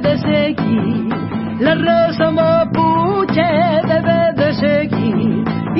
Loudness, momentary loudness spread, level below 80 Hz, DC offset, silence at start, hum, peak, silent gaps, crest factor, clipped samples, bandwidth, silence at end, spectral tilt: -15 LUFS; 5 LU; -44 dBFS; under 0.1%; 0 s; none; -2 dBFS; none; 12 dB; under 0.1%; 5.8 kHz; 0 s; -11.5 dB/octave